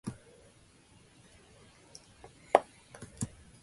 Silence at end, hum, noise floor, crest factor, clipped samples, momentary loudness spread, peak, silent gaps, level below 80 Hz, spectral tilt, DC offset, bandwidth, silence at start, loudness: 0.35 s; none; -61 dBFS; 34 dB; under 0.1%; 26 LU; -4 dBFS; none; -64 dBFS; -5 dB/octave; under 0.1%; 11.5 kHz; 0.05 s; -33 LUFS